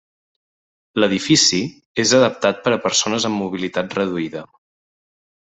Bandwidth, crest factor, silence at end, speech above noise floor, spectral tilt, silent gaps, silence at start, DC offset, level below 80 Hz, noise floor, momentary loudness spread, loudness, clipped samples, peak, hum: 8.4 kHz; 18 dB; 1.1 s; over 72 dB; -3 dB/octave; 1.85-1.95 s; 0.95 s; under 0.1%; -60 dBFS; under -90 dBFS; 12 LU; -18 LUFS; under 0.1%; -2 dBFS; none